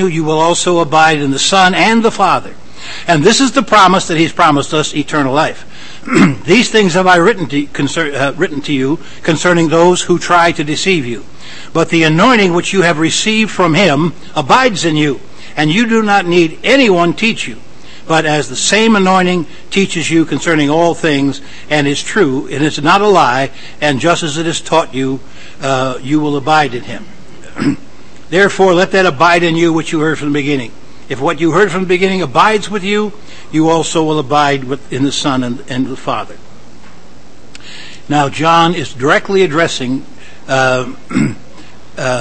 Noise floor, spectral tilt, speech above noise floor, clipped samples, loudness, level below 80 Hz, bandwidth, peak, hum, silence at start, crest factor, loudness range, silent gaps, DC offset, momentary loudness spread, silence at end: -39 dBFS; -4.5 dB/octave; 28 dB; 0.3%; -12 LUFS; -44 dBFS; 11 kHz; 0 dBFS; none; 0 s; 12 dB; 5 LU; none; 6%; 11 LU; 0 s